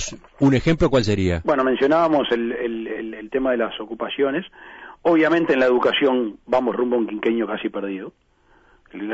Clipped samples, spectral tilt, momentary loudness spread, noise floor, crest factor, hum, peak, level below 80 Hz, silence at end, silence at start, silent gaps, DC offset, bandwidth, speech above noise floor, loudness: under 0.1%; -6 dB/octave; 13 LU; -56 dBFS; 14 dB; none; -8 dBFS; -44 dBFS; 0 s; 0 s; none; under 0.1%; 8 kHz; 35 dB; -20 LUFS